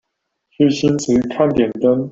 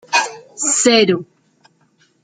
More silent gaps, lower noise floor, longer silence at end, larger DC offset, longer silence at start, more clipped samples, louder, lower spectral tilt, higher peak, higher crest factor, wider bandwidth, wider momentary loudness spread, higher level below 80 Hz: neither; first, -74 dBFS vs -58 dBFS; second, 0 s vs 1 s; neither; first, 0.6 s vs 0.1 s; neither; about the same, -16 LUFS vs -15 LUFS; first, -6 dB/octave vs -2 dB/octave; about the same, 0 dBFS vs -2 dBFS; about the same, 16 dB vs 18 dB; second, 8 kHz vs 9.6 kHz; second, 2 LU vs 11 LU; first, -48 dBFS vs -64 dBFS